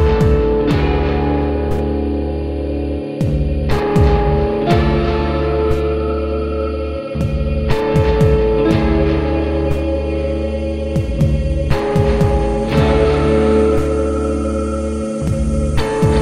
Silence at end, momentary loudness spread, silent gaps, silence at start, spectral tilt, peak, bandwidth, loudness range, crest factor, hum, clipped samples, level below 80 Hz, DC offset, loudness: 0 s; 7 LU; none; 0 s; -8 dB/octave; 0 dBFS; 11.5 kHz; 3 LU; 14 dB; none; under 0.1%; -20 dBFS; 0.6%; -17 LUFS